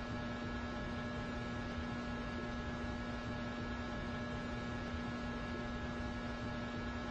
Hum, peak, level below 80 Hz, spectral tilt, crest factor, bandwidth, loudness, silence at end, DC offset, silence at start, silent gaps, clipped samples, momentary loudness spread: none; -30 dBFS; -50 dBFS; -6 dB/octave; 12 dB; 8.6 kHz; -42 LUFS; 0 s; under 0.1%; 0 s; none; under 0.1%; 0 LU